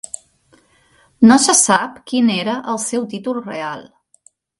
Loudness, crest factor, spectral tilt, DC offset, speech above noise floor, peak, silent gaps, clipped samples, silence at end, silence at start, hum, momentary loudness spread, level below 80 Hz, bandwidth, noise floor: -15 LUFS; 18 dB; -3 dB/octave; under 0.1%; 40 dB; 0 dBFS; none; under 0.1%; 0.8 s; 1.2 s; none; 17 LU; -60 dBFS; 11.5 kHz; -55 dBFS